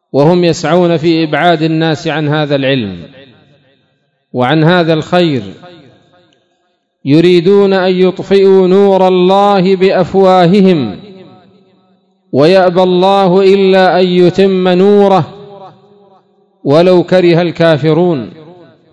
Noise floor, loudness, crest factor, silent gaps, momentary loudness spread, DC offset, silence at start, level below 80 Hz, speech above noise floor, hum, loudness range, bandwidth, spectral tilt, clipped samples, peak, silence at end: -61 dBFS; -9 LUFS; 10 dB; none; 8 LU; under 0.1%; 0.15 s; -52 dBFS; 53 dB; none; 6 LU; 8.6 kHz; -7 dB/octave; 2%; 0 dBFS; 0.6 s